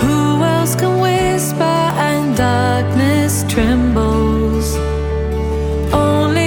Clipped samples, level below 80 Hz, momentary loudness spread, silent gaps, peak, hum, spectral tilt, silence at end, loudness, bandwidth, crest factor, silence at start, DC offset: under 0.1%; -24 dBFS; 5 LU; none; 0 dBFS; none; -5.5 dB/octave; 0 s; -15 LUFS; 19 kHz; 14 dB; 0 s; under 0.1%